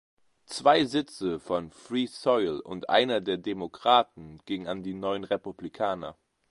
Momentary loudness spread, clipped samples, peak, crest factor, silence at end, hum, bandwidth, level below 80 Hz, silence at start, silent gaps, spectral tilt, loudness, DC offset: 13 LU; under 0.1%; -6 dBFS; 22 dB; 0.4 s; none; 11.5 kHz; -64 dBFS; 0.5 s; none; -4.5 dB/octave; -28 LUFS; under 0.1%